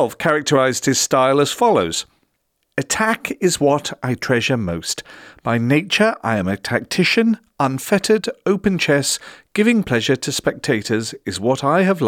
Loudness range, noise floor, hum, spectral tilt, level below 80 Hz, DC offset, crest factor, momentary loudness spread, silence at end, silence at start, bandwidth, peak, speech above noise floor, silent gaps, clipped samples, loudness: 2 LU; -69 dBFS; none; -4 dB/octave; -52 dBFS; under 0.1%; 14 dB; 8 LU; 0 s; 0 s; 17.5 kHz; -4 dBFS; 51 dB; none; under 0.1%; -18 LUFS